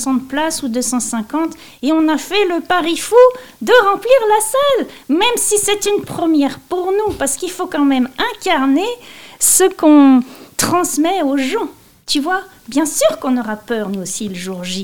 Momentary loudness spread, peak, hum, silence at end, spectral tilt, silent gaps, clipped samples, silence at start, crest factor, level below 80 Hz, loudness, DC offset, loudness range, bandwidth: 11 LU; 0 dBFS; none; 0 s; -2.5 dB/octave; none; 0.1%; 0 s; 14 dB; -50 dBFS; -15 LUFS; 0.9%; 4 LU; 18 kHz